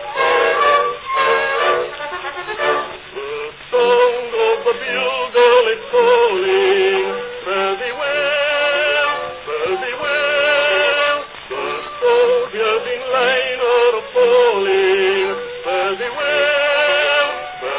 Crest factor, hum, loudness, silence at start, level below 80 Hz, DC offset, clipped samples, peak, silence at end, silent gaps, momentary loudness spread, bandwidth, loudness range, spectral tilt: 14 dB; none; -16 LUFS; 0 s; -56 dBFS; under 0.1%; under 0.1%; -2 dBFS; 0 s; none; 10 LU; 4 kHz; 3 LU; -6.5 dB/octave